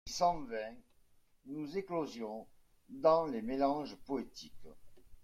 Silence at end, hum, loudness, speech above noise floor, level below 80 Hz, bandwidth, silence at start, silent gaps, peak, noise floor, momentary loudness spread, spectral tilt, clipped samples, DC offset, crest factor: 0 s; none; -36 LUFS; 31 dB; -62 dBFS; 14.5 kHz; 0.05 s; none; -16 dBFS; -67 dBFS; 19 LU; -5 dB/octave; under 0.1%; under 0.1%; 22 dB